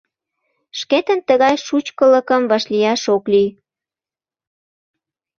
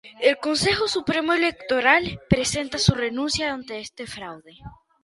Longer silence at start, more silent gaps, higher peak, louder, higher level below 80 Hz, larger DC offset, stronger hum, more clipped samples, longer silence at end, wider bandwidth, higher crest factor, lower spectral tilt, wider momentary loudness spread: first, 0.75 s vs 0.05 s; neither; about the same, -2 dBFS vs -2 dBFS; first, -16 LUFS vs -22 LUFS; second, -64 dBFS vs -44 dBFS; neither; neither; neither; first, 1.9 s vs 0.3 s; second, 7.4 kHz vs 11.5 kHz; second, 16 dB vs 22 dB; about the same, -4 dB/octave vs -4 dB/octave; second, 8 LU vs 16 LU